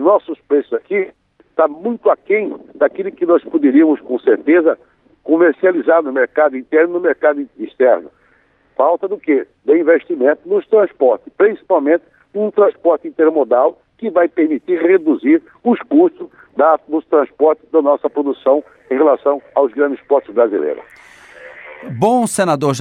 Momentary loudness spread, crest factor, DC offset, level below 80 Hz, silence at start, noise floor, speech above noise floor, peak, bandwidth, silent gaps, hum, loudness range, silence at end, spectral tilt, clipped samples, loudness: 8 LU; 14 dB; under 0.1%; -66 dBFS; 0 s; -55 dBFS; 41 dB; -2 dBFS; 13.5 kHz; none; none; 3 LU; 0 s; -6 dB/octave; under 0.1%; -15 LUFS